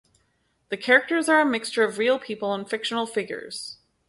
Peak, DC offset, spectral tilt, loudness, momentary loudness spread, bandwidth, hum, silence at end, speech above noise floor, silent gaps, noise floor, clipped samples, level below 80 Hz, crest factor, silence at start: -4 dBFS; under 0.1%; -3 dB/octave; -23 LUFS; 15 LU; 12 kHz; none; 0.35 s; 46 dB; none; -69 dBFS; under 0.1%; -72 dBFS; 20 dB; 0.7 s